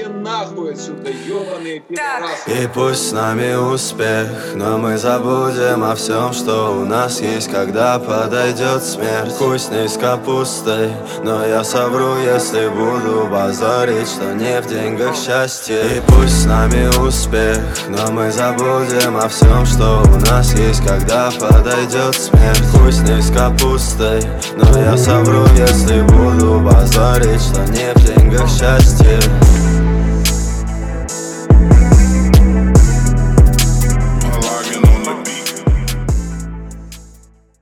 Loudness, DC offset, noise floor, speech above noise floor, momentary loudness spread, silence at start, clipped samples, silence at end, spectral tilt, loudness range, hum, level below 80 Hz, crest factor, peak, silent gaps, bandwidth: -13 LUFS; under 0.1%; -44 dBFS; 32 dB; 11 LU; 0 s; under 0.1%; 0.6 s; -5.5 dB/octave; 6 LU; none; -16 dBFS; 12 dB; 0 dBFS; none; 16.5 kHz